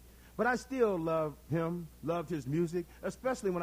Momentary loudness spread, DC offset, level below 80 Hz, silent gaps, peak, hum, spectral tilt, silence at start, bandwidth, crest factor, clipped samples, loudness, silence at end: 7 LU; under 0.1%; -58 dBFS; none; -16 dBFS; none; -6.5 dB/octave; 0 s; 16.5 kHz; 18 dB; under 0.1%; -34 LUFS; 0 s